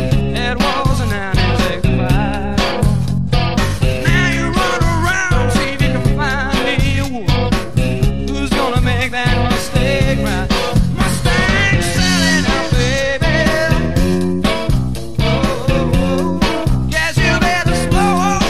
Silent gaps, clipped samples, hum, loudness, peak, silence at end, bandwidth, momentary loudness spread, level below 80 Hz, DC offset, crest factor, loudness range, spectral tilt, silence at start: none; under 0.1%; none; -15 LUFS; 0 dBFS; 0 s; 15 kHz; 4 LU; -22 dBFS; 5%; 14 dB; 2 LU; -5 dB/octave; 0 s